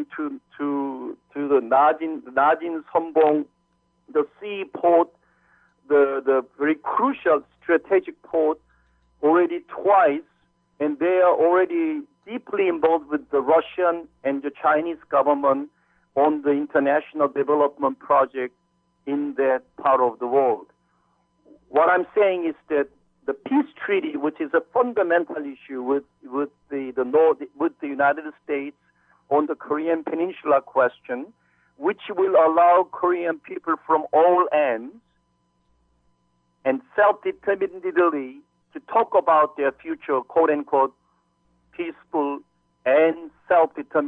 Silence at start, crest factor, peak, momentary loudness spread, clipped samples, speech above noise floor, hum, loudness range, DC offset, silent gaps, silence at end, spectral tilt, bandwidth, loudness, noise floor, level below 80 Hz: 0 s; 14 dB; -8 dBFS; 13 LU; under 0.1%; 47 dB; 60 Hz at -70 dBFS; 4 LU; under 0.1%; none; 0 s; -8.5 dB/octave; 4 kHz; -22 LUFS; -68 dBFS; -72 dBFS